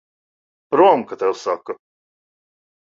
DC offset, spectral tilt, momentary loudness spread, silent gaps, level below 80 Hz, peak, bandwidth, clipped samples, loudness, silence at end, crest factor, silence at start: under 0.1%; -5.5 dB/octave; 18 LU; none; -70 dBFS; -2 dBFS; 7.8 kHz; under 0.1%; -18 LUFS; 1.25 s; 20 dB; 0.7 s